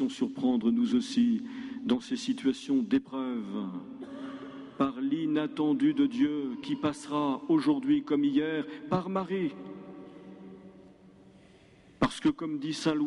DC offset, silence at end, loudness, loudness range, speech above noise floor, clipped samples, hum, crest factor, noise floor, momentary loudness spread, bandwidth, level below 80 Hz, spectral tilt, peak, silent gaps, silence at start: under 0.1%; 0 s; -30 LUFS; 7 LU; 28 dB; under 0.1%; none; 18 dB; -57 dBFS; 16 LU; 11.5 kHz; -64 dBFS; -6 dB/octave; -12 dBFS; none; 0 s